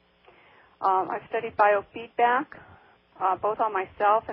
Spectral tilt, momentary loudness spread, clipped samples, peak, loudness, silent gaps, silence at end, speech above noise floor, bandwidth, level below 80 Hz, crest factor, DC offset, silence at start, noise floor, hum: -8.5 dB/octave; 8 LU; under 0.1%; -6 dBFS; -26 LUFS; none; 0 s; 32 dB; 5.6 kHz; -66 dBFS; 20 dB; under 0.1%; 0.8 s; -57 dBFS; none